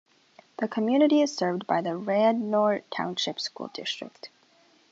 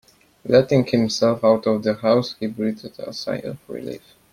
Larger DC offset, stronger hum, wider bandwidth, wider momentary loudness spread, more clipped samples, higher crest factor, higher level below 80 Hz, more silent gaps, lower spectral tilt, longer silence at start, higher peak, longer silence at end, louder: neither; neither; second, 8 kHz vs 15 kHz; about the same, 14 LU vs 16 LU; neither; about the same, 18 dB vs 18 dB; second, -80 dBFS vs -58 dBFS; neither; about the same, -5 dB/octave vs -6 dB/octave; first, 0.6 s vs 0.45 s; second, -8 dBFS vs -2 dBFS; first, 0.65 s vs 0.35 s; second, -26 LUFS vs -20 LUFS